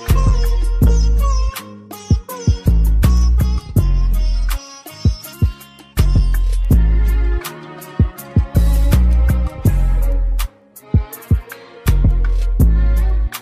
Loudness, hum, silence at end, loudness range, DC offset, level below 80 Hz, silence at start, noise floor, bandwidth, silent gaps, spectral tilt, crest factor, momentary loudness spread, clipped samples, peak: -17 LUFS; none; 0 s; 2 LU; under 0.1%; -16 dBFS; 0 s; -34 dBFS; 15.5 kHz; none; -6.5 dB/octave; 14 dB; 10 LU; under 0.1%; -2 dBFS